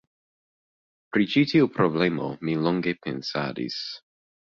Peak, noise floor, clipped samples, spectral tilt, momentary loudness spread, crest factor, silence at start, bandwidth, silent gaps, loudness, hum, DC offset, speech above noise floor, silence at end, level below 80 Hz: -8 dBFS; under -90 dBFS; under 0.1%; -7 dB/octave; 10 LU; 20 dB; 1.15 s; 7.4 kHz; none; -25 LUFS; none; under 0.1%; over 66 dB; 0.6 s; -64 dBFS